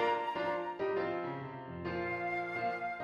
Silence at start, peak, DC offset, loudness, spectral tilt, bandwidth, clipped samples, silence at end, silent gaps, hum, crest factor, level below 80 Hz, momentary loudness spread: 0 s; -20 dBFS; under 0.1%; -37 LUFS; -7 dB/octave; 11.5 kHz; under 0.1%; 0 s; none; none; 16 dB; -68 dBFS; 7 LU